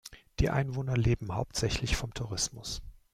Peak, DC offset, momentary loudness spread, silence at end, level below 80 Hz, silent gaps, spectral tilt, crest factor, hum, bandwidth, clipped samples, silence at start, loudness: -12 dBFS; under 0.1%; 10 LU; 0.2 s; -42 dBFS; none; -4.5 dB/octave; 20 dB; none; 15.5 kHz; under 0.1%; 0.05 s; -32 LUFS